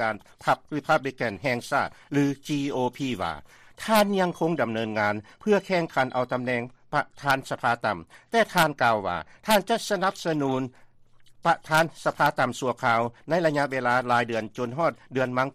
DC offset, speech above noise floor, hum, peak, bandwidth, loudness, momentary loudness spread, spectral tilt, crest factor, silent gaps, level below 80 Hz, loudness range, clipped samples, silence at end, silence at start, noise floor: under 0.1%; 27 dB; none; -8 dBFS; 15 kHz; -26 LUFS; 7 LU; -5 dB/octave; 16 dB; none; -60 dBFS; 2 LU; under 0.1%; 0.05 s; 0 s; -53 dBFS